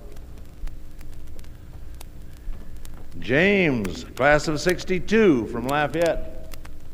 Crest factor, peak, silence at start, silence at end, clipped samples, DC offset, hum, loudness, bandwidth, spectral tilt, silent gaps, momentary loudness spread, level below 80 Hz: 20 dB; -4 dBFS; 0 s; 0 s; under 0.1%; under 0.1%; none; -21 LUFS; 16 kHz; -5.5 dB/octave; none; 25 LU; -36 dBFS